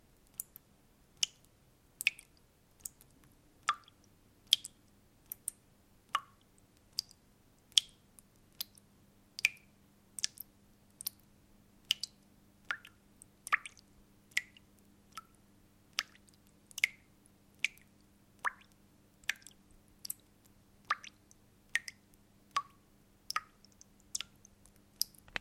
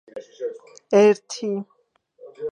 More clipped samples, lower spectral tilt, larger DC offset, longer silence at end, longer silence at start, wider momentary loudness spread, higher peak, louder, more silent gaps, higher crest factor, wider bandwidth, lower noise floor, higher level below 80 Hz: neither; second, 1.5 dB/octave vs -5 dB/octave; neither; about the same, 0 s vs 0 s; first, 0.4 s vs 0.15 s; about the same, 20 LU vs 20 LU; about the same, -4 dBFS vs -4 dBFS; second, -38 LUFS vs -21 LUFS; neither; first, 40 dB vs 18 dB; first, 16.5 kHz vs 9.8 kHz; first, -67 dBFS vs -58 dBFS; about the same, -72 dBFS vs -76 dBFS